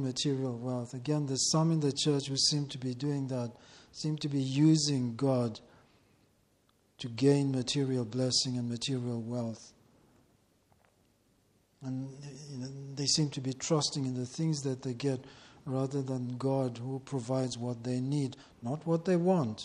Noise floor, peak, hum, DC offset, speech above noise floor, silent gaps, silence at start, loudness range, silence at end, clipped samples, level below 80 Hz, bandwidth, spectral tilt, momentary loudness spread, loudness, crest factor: -70 dBFS; -14 dBFS; none; under 0.1%; 38 dB; none; 0 s; 8 LU; 0 s; under 0.1%; -70 dBFS; 11.5 kHz; -5 dB/octave; 14 LU; -32 LUFS; 20 dB